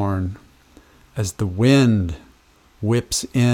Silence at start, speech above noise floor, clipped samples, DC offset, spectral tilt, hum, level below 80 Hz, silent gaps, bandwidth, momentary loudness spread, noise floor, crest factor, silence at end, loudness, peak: 0 s; 36 dB; under 0.1%; under 0.1%; -5.5 dB/octave; none; -44 dBFS; none; 16.5 kHz; 18 LU; -54 dBFS; 18 dB; 0 s; -20 LUFS; -4 dBFS